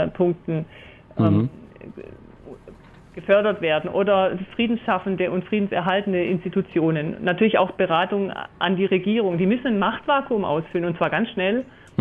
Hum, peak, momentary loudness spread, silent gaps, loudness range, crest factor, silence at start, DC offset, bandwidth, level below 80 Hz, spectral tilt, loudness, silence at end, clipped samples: none; -8 dBFS; 10 LU; none; 3 LU; 16 dB; 0 s; under 0.1%; 4.3 kHz; -56 dBFS; -9 dB/octave; -22 LUFS; 0.35 s; under 0.1%